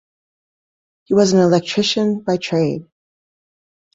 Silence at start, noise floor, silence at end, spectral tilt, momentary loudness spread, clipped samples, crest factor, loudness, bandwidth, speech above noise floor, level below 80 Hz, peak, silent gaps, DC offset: 1.1 s; under -90 dBFS; 1.1 s; -5.5 dB/octave; 8 LU; under 0.1%; 18 dB; -17 LUFS; 7.8 kHz; over 74 dB; -58 dBFS; -2 dBFS; none; under 0.1%